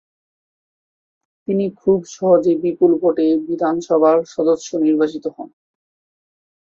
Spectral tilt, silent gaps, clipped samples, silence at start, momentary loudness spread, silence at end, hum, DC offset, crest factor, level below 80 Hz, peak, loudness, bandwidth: -7 dB/octave; none; under 0.1%; 1.5 s; 12 LU; 1.2 s; none; under 0.1%; 16 dB; -62 dBFS; -2 dBFS; -17 LUFS; 7.4 kHz